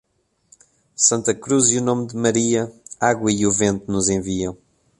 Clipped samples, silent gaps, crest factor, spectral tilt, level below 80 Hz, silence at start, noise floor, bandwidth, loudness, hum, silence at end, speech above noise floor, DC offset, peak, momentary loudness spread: under 0.1%; none; 18 dB; -4 dB/octave; -50 dBFS; 1 s; -58 dBFS; 11.5 kHz; -19 LUFS; none; 0.45 s; 39 dB; under 0.1%; -2 dBFS; 9 LU